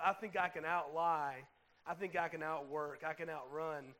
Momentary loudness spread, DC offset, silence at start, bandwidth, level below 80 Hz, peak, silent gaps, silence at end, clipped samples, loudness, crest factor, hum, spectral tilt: 8 LU; under 0.1%; 0 s; 16 kHz; -80 dBFS; -20 dBFS; none; 0.05 s; under 0.1%; -40 LUFS; 22 dB; none; -5.5 dB/octave